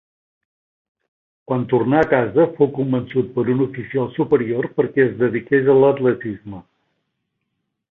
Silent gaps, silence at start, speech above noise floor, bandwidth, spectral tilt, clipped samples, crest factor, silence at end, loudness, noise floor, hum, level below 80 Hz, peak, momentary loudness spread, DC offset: none; 1.5 s; 58 dB; 4 kHz; -10 dB/octave; under 0.1%; 18 dB; 1.3 s; -18 LUFS; -75 dBFS; none; -56 dBFS; -2 dBFS; 10 LU; under 0.1%